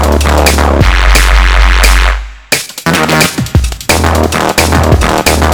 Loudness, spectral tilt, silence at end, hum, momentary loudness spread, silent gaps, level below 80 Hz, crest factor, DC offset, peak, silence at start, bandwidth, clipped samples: -9 LUFS; -4 dB/octave; 0 s; none; 5 LU; none; -10 dBFS; 8 dB; under 0.1%; 0 dBFS; 0 s; over 20 kHz; 3%